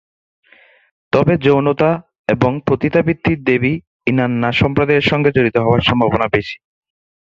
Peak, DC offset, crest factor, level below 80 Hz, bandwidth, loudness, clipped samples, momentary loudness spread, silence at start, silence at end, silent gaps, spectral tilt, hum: 0 dBFS; under 0.1%; 16 dB; -40 dBFS; 7.6 kHz; -15 LUFS; under 0.1%; 6 LU; 1.15 s; 0.65 s; 2.19-2.24 s, 3.87-4.00 s; -8 dB/octave; none